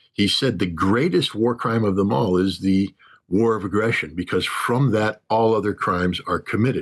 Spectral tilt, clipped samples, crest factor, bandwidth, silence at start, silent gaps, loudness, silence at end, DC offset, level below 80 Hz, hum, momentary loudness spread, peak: -6 dB/octave; under 0.1%; 12 dB; 12.5 kHz; 0.2 s; none; -21 LUFS; 0 s; under 0.1%; -56 dBFS; none; 4 LU; -10 dBFS